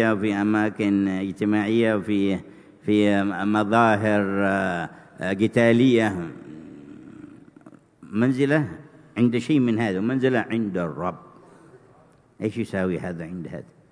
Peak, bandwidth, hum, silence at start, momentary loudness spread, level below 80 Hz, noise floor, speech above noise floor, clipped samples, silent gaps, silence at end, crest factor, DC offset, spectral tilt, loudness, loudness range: -4 dBFS; 10.5 kHz; none; 0 s; 18 LU; -62 dBFS; -55 dBFS; 33 dB; under 0.1%; none; 0.3 s; 20 dB; under 0.1%; -7 dB/octave; -23 LUFS; 6 LU